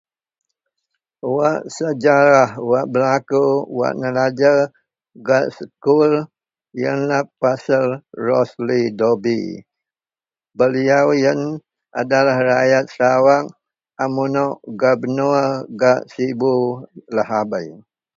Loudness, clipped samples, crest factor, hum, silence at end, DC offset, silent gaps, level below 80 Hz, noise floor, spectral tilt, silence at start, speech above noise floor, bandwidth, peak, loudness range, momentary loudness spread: -17 LUFS; under 0.1%; 18 dB; none; 0.4 s; under 0.1%; none; -64 dBFS; under -90 dBFS; -6.5 dB/octave; 1.25 s; over 73 dB; 7.8 kHz; 0 dBFS; 3 LU; 11 LU